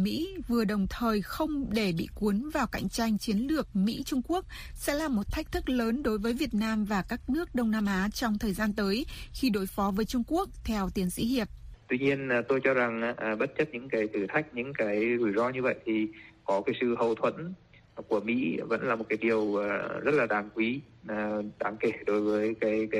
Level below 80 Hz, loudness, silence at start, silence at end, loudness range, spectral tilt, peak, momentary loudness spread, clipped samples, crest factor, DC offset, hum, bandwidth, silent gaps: -48 dBFS; -30 LUFS; 0 s; 0 s; 1 LU; -5.5 dB/octave; -12 dBFS; 6 LU; under 0.1%; 18 dB; under 0.1%; none; 15.5 kHz; none